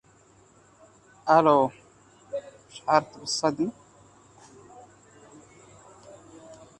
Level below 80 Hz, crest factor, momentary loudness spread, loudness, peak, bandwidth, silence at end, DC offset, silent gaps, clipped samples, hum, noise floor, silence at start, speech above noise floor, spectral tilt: -68 dBFS; 24 dB; 28 LU; -25 LUFS; -6 dBFS; 11 kHz; 0.25 s; under 0.1%; none; under 0.1%; none; -58 dBFS; 1.25 s; 35 dB; -4.5 dB/octave